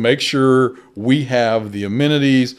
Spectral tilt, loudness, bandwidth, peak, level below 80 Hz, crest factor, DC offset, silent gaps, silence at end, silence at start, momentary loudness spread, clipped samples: -6 dB/octave; -16 LUFS; 12.5 kHz; 0 dBFS; -60 dBFS; 16 dB; under 0.1%; none; 0.05 s; 0 s; 7 LU; under 0.1%